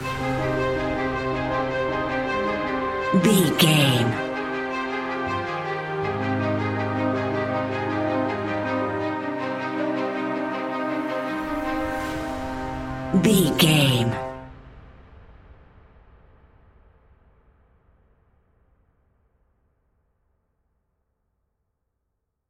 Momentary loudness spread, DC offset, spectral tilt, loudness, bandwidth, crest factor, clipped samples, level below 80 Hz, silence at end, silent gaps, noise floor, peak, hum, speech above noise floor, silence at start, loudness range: 10 LU; under 0.1%; -5 dB/octave; -24 LUFS; 16 kHz; 22 dB; under 0.1%; -48 dBFS; 6.95 s; none; -78 dBFS; -4 dBFS; none; 60 dB; 0 s; 6 LU